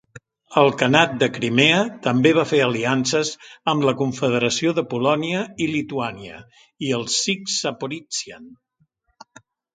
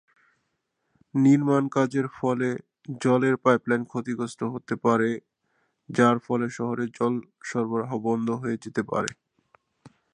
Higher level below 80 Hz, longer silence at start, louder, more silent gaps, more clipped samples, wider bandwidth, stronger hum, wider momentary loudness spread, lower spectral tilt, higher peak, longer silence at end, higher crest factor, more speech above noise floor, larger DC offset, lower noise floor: first, -62 dBFS vs -70 dBFS; second, 0.15 s vs 1.15 s; first, -20 LUFS vs -25 LUFS; neither; neither; about the same, 9.6 kHz vs 10.5 kHz; neither; about the same, 11 LU vs 10 LU; second, -4 dB/octave vs -7 dB/octave; first, 0 dBFS vs -4 dBFS; first, 1.2 s vs 0.25 s; about the same, 22 dB vs 22 dB; second, 45 dB vs 52 dB; neither; second, -66 dBFS vs -77 dBFS